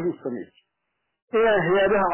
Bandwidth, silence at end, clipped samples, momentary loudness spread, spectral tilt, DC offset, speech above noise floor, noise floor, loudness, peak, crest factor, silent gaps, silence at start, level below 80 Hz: 3.2 kHz; 0 s; under 0.1%; 14 LU; -9.5 dB/octave; under 0.1%; 57 dB; -78 dBFS; -21 LUFS; -12 dBFS; 12 dB; 1.22-1.28 s; 0 s; -54 dBFS